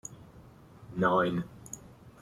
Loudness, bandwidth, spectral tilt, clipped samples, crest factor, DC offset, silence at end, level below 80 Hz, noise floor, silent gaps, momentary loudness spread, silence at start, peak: -30 LUFS; 14.5 kHz; -5.5 dB/octave; under 0.1%; 20 dB; under 0.1%; 0.1 s; -60 dBFS; -54 dBFS; none; 20 LU; 0.1 s; -14 dBFS